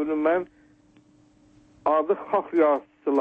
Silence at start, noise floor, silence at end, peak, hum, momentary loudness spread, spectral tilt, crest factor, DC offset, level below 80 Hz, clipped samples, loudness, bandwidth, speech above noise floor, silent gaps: 0 s; -58 dBFS; 0 s; -10 dBFS; none; 6 LU; -7.5 dB/octave; 16 dB; under 0.1%; -66 dBFS; under 0.1%; -24 LUFS; 4.7 kHz; 35 dB; none